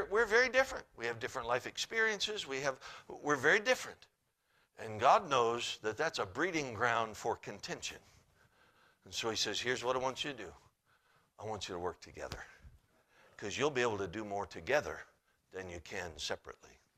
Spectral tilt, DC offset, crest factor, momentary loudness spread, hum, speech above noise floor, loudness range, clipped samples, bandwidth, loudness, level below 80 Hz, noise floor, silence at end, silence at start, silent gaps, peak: -3 dB/octave; under 0.1%; 24 dB; 19 LU; none; 40 dB; 7 LU; under 0.1%; 15 kHz; -35 LUFS; -66 dBFS; -76 dBFS; 0.3 s; 0 s; none; -14 dBFS